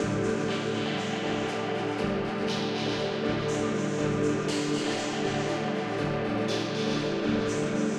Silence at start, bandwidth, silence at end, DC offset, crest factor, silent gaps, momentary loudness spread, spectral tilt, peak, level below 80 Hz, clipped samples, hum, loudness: 0 s; 12 kHz; 0 s; under 0.1%; 12 dB; none; 2 LU; -5 dB/octave; -16 dBFS; -54 dBFS; under 0.1%; none; -29 LUFS